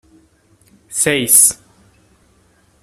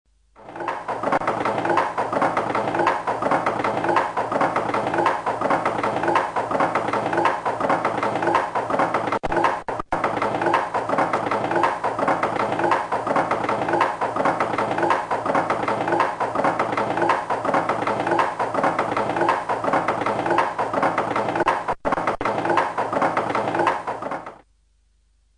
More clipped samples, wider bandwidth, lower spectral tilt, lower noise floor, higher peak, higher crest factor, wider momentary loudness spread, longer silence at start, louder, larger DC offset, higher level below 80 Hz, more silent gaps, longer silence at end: neither; first, over 20 kHz vs 10.5 kHz; second, -1.5 dB/octave vs -5.5 dB/octave; second, -54 dBFS vs -62 dBFS; first, 0 dBFS vs -6 dBFS; about the same, 20 dB vs 16 dB; first, 17 LU vs 3 LU; first, 0.9 s vs 0.4 s; first, -11 LUFS vs -22 LUFS; neither; about the same, -56 dBFS vs -52 dBFS; neither; first, 1.3 s vs 1 s